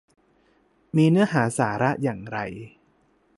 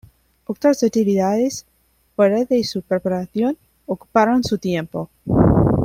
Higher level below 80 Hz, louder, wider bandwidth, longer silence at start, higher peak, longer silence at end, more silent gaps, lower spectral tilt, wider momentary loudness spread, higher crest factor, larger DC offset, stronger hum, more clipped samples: second, -60 dBFS vs -38 dBFS; second, -23 LUFS vs -19 LUFS; second, 11.5 kHz vs 16 kHz; first, 0.95 s vs 0.5 s; second, -6 dBFS vs -2 dBFS; first, 0.7 s vs 0 s; neither; about the same, -6.5 dB/octave vs -6.5 dB/octave; about the same, 13 LU vs 14 LU; about the same, 18 dB vs 16 dB; neither; neither; neither